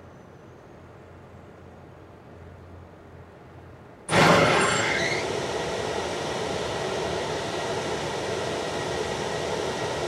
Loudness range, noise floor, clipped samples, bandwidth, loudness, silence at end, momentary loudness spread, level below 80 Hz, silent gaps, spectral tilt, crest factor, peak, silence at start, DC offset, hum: 5 LU; -47 dBFS; under 0.1%; 15.5 kHz; -25 LUFS; 0 s; 27 LU; -52 dBFS; none; -4 dB/octave; 22 dB; -6 dBFS; 0 s; under 0.1%; none